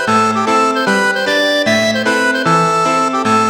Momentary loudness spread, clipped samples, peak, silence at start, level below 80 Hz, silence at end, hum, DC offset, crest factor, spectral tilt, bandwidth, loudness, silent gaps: 1 LU; under 0.1%; 0 dBFS; 0 s; -56 dBFS; 0 s; none; under 0.1%; 12 dB; -3.5 dB/octave; 17.5 kHz; -13 LUFS; none